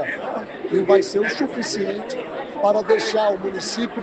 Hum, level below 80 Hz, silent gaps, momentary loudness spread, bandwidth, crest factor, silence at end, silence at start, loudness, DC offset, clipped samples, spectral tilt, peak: none; -62 dBFS; none; 12 LU; 9 kHz; 18 dB; 0 s; 0 s; -21 LUFS; under 0.1%; under 0.1%; -4 dB/octave; -2 dBFS